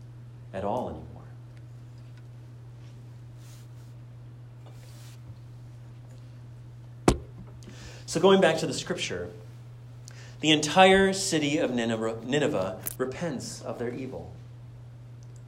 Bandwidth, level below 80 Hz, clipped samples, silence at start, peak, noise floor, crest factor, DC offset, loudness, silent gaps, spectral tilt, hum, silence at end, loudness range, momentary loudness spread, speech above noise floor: 16 kHz; -50 dBFS; under 0.1%; 0 s; -6 dBFS; -45 dBFS; 24 dB; under 0.1%; -26 LUFS; none; -4.5 dB/octave; none; 0 s; 22 LU; 25 LU; 20 dB